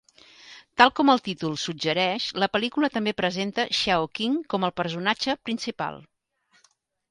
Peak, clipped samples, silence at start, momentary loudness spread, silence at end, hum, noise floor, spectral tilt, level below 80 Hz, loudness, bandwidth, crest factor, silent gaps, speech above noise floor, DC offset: -2 dBFS; under 0.1%; 0.45 s; 10 LU; 1.1 s; none; -66 dBFS; -4 dB/octave; -62 dBFS; -24 LUFS; 11.5 kHz; 24 dB; none; 41 dB; under 0.1%